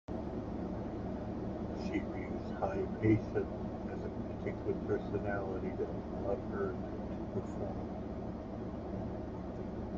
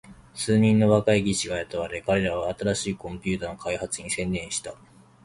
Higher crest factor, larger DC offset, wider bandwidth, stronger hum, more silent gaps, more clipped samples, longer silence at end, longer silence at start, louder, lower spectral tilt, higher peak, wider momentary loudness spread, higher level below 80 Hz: about the same, 20 dB vs 20 dB; neither; second, 7.4 kHz vs 11.5 kHz; neither; neither; neither; second, 0 s vs 0.5 s; about the same, 0.1 s vs 0.05 s; second, -39 LUFS vs -25 LUFS; first, -9 dB/octave vs -5 dB/octave; second, -18 dBFS vs -6 dBFS; second, 6 LU vs 12 LU; about the same, -50 dBFS vs -50 dBFS